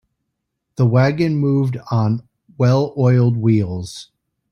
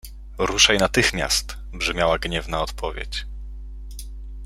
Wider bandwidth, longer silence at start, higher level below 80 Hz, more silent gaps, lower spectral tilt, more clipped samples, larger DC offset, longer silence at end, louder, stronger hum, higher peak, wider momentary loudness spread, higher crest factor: second, 10.5 kHz vs 16 kHz; first, 0.8 s vs 0.05 s; second, -54 dBFS vs -34 dBFS; neither; first, -8.5 dB/octave vs -2.5 dB/octave; neither; neither; first, 0.5 s vs 0 s; first, -17 LUFS vs -21 LUFS; neither; about the same, -4 dBFS vs -2 dBFS; second, 12 LU vs 23 LU; second, 14 dB vs 22 dB